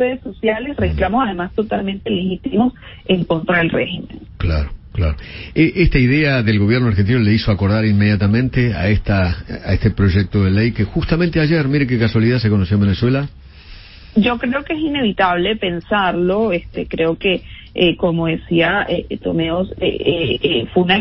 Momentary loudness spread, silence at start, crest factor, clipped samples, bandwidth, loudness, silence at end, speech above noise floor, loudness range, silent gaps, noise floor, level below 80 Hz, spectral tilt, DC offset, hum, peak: 7 LU; 0 s; 16 dB; under 0.1%; 5.8 kHz; -17 LUFS; 0 s; 22 dB; 4 LU; none; -38 dBFS; -30 dBFS; -11 dB/octave; under 0.1%; none; -2 dBFS